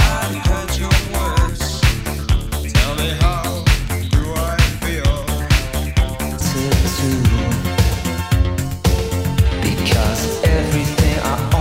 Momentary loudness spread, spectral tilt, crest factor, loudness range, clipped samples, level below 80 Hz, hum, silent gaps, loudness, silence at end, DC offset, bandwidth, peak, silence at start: 4 LU; -5 dB/octave; 16 dB; 1 LU; under 0.1%; -20 dBFS; none; none; -18 LUFS; 0 s; under 0.1%; 16.5 kHz; 0 dBFS; 0 s